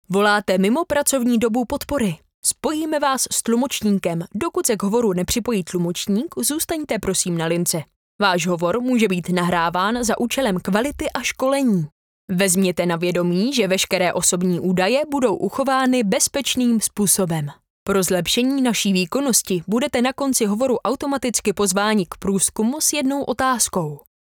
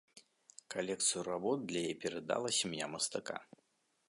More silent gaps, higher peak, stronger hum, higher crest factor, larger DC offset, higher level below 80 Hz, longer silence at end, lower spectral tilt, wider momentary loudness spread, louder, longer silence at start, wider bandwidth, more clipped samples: first, 2.34-2.43 s, 7.96-8.19 s, 11.92-12.28 s, 17.70-17.86 s vs none; first, -2 dBFS vs -20 dBFS; neither; about the same, 18 dB vs 20 dB; neither; first, -50 dBFS vs -78 dBFS; second, 0.25 s vs 0.65 s; first, -4 dB/octave vs -2.5 dB/octave; second, 5 LU vs 9 LU; first, -20 LUFS vs -37 LUFS; about the same, 0.1 s vs 0.15 s; first, over 20 kHz vs 11.5 kHz; neither